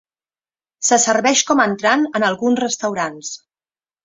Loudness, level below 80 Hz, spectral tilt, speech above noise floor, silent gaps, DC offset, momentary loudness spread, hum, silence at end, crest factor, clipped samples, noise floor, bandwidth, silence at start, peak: -16 LUFS; -64 dBFS; -2 dB/octave; over 73 dB; none; under 0.1%; 12 LU; none; 0.7 s; 18 dB; under 0.1%; under -90 dBFS; 8 kHz; 0.8 s; 0 dBFS